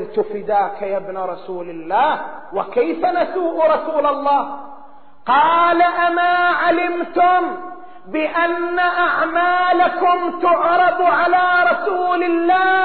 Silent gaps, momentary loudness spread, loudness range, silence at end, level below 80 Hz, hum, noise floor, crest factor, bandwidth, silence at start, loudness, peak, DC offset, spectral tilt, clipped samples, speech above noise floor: none; 12 LU; 4 LU; 0 s; -58 dBFS; none; -45 dBFS; 12 dB; 4.5 kHz; 0 s; -17 LUFS; -4 dBFS; 1%; -1 dB/octave; under 0.1%; 28 dB